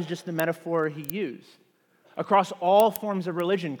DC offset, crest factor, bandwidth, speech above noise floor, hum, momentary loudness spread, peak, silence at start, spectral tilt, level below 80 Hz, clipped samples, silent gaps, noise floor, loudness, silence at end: under 0.1%; 22 dB; 19 kHz; 36 dB; none; 14 LU; -6 dBFS; 0 s; -5.5 dB/octave; -78 dBFS; under 0.1%; none; -61 dBFS; -26 LUFS; 0 s